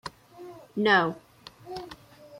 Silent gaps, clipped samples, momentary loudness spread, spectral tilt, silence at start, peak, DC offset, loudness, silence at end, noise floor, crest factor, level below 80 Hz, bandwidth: none; under 0.1%; 26 LU; -5.5 dB/octave; 0.05 s; -8 dBFS; under 0.1%; -25 LUFS; 0 s; -49 dBFS; 22 dB; -66 dBFS; 16 kHz